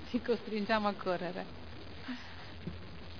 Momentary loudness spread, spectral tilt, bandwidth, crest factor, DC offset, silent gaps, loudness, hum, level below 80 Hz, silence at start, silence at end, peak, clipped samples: 16 LU; -4 dB/octave; 5.4 kHz; 22 dB; 0.4%; none; -37 LUFS; none; -58 dBFS; 0 s; 0 s; -16 dBFS; under 0.1%